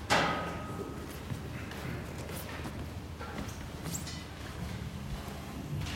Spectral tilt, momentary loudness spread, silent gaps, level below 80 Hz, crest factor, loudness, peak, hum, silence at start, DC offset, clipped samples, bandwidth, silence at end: -4.5 dB/octave; 7 LU; none; -50 dBFS; 24 dB; -38 LUFS; -14 dBFS; none; 0 s; under 0.1%; under 0.1%; 16 kHz; 0 s